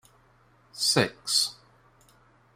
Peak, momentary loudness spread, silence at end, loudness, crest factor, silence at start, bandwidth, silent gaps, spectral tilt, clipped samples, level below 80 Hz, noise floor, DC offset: -8 dBFS; 7 LU; 1 s; -25 LUFS; 22 dB; 0.75 s; 16 kHz; none; -2 dB/octave; under 0.1%; -68 dBFS; -61 dBFS; under 0.1%